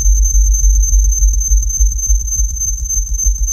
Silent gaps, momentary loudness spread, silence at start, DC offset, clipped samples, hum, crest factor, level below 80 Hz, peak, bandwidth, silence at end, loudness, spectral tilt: none; 4 LU; 0 s; under 0.1%; under 0.1%; none; 10 dB; -12 dBFS; -2 dBFS; 13.5 kHz; 0 s; -14 LUFS; -3.5 dB/octave